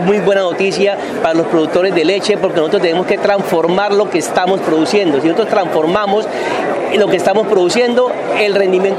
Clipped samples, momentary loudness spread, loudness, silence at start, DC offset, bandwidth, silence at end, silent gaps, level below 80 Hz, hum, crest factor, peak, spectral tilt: under 0.1%; 3 LU; -13 LUFS; 0 s; under 0.1%; 14.5 kHz; 0 s; none; -54 dBFS; none; 12 dB; 0 dBFS; -5 dB/octave